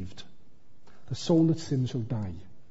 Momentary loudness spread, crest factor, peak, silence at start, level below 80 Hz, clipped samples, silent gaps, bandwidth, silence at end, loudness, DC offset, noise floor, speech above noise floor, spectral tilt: 21 LU; 18 dB; -12 dBFS; 0 s; -60 dBFS; under 0.1%; none; 8 kHz; 0 s; -29 LUFS; 1%; -55 dBFS; 28 dB; -7.5 dB/octave